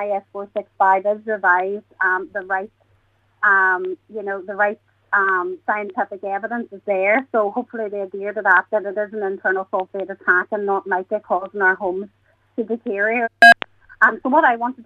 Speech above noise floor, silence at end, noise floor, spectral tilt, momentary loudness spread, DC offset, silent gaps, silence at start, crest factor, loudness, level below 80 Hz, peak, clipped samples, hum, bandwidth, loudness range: 41 dB; 0.05 s; -60 dBFS; -4.5 dB/octave; 12 LU; under 0.1%; none; 0 s; 18 dB; -19 LUFS; -68 dBFS; -2 dBFS; under 0.1%; none; 13.5 kHz; 5 LU